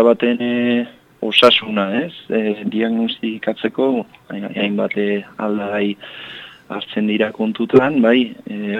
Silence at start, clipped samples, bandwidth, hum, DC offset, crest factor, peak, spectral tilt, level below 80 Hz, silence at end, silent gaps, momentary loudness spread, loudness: 0 s; under 0.1%; 10.5 kHz; none; under 0.1%; 18 dB; 0 dBFS; -6 dB/octave; -64 dBFS; 0 s; none; 16 LU; -18 LUFS